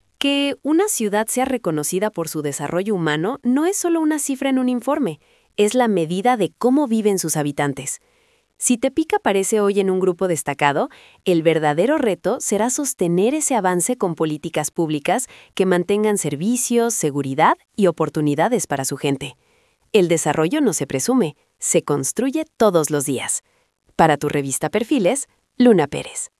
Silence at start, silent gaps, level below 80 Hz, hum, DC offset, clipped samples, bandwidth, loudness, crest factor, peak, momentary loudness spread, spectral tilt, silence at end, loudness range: 0.2 s; none; -60 dBFS; none; under 0.1%; under 0.1%; 12 kHz; -19 LUFS; 20 dB; 0 dBFS; 6 LU; -4.5 dB/octave; 0.15 s; 2 LU